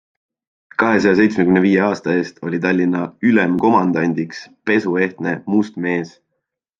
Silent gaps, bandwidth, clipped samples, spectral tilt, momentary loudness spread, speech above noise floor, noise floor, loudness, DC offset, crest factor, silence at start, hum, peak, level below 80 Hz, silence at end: none; 7.6 kHz; under 0.1%; -7 dB/octave; 10 LU; 59 dB; -76 dBFS; -17 LUFS; under 0.1%; 16 dB; 0.8 s; none; -2 dBFS; -60 dBFS; 0.7 s